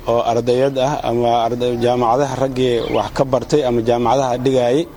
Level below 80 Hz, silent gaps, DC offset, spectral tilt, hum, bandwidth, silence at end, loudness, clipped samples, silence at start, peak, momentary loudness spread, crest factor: -40 dBFS; none; under 0.1%; -6 dB/octave; none; 20 kHz; 0 s; -17 LUFS; under 0.1%; 0 s; 0 dBFS; 3 LU; 16 dB